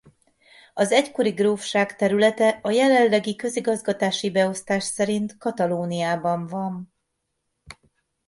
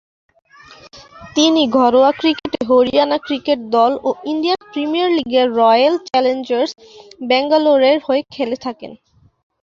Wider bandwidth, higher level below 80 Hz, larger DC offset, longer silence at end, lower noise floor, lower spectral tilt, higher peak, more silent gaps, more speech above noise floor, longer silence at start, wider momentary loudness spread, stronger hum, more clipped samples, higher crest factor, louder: first, 11.5 kHz vs 7.4 kHz; second, -66 dBFS vs -56 dBFS; neither; second, 0.55 s vs 0.7 s; first, -77 dBFS vs -43 dBFS; about the same, -4.5 dB/octave vs -3.5 dB/octave; about the same, -4 dBFS vs -2 dBFS; neither; first, 55 dB vs 28 dB; second, 0.75 s vs 0.95 s; about the same, 9 LU vs 10 LU; neither; neither; first, 20 dB vs 14 dB; second, -22 LUFS vs -15 LUFS